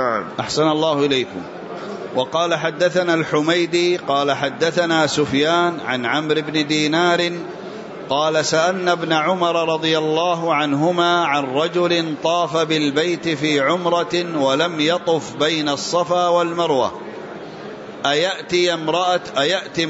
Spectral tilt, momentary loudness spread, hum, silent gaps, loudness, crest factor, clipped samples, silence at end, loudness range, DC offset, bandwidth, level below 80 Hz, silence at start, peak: -4 dB/octave; 8 LU; none; none; -18 LUFS; 14 dB; under 0.1%; 0 s; 2 LU; under 0.1%; 8 kHz; -62 dBFS; 0 s; -4 dBFS